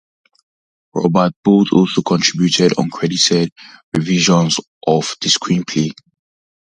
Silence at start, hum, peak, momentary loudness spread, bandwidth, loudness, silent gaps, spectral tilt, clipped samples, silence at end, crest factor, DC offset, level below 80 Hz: 0.95 s; none; 0 dBFS; 8 LU; 10 kHz; -15 LUFS; 1.36-1.43 s, 3.52-3.56 s, 3.83-3.92 s, 4.67-4.81 s; -4.5 dB/octave; under 0.1%; 0.7 s; 16 dB; under 0.1%; -54 dBFS